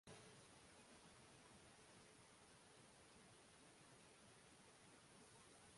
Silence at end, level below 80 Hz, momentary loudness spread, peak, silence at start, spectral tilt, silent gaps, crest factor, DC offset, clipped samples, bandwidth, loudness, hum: 0 s; -84 dBFS; 2 LU; -48 dBFS; 0.05 s; -3 dB/octave; none; 18 dB; under 0.1%; under 0.1%; 11.5 kHz; -66 LUFS; none